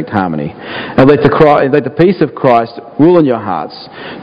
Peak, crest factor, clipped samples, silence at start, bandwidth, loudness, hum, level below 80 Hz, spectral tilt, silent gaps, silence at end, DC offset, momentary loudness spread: 0 dBFS; 10 dB; 1%; 0 s; 5.8 kHz; -10 LUFS; none; -40 dBFS; -9 dB/octave; none; 0 s; under 0.1%; 14 LU